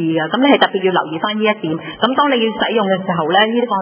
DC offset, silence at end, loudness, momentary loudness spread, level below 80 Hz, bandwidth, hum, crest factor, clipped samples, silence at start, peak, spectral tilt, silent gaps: under 0.1%; 0 s; -15 LUFS; 6 LU; -60 dBFS; 4 kHz; none; 16 dB; under 0.1%; 0 s; 0 dBFS; -9 dB/octave; none